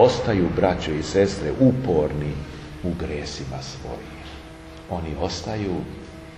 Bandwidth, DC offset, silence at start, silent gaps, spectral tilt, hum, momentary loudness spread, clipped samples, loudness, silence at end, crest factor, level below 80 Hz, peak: 12 kHz; under 0.1%; 0 s; none; -6.5 dB/octave; none; 18 LU; under 0.1%; -24 LUFS; 0 s; 20 dB; -40 dBFS; -2 dBFS